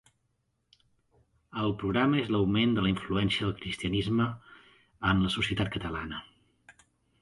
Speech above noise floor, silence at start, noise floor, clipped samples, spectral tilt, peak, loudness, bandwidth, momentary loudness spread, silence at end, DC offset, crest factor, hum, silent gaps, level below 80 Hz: 48 dB; 1.55 s; -76 dBFS; under 0.1%; -6.5 dB/octave; -10 dBFS; -29 LUFS; 11.5 kHz; 10 LU; 0.5 s; under 0.1%; 20 dB; none; none; -50 dBFS